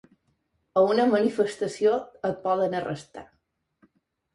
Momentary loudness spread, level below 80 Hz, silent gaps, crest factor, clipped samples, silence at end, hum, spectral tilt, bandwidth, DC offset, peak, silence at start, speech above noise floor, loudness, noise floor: 14 LU; -68 dBFS; none; 18 dB; under 0.1%; 1.1 s; none; -6 dB/octave; 11.5 kHz; under 0.1%; -8 dBFS; 0.75 s; 48 dB; -25 LUFS; -72 dBFS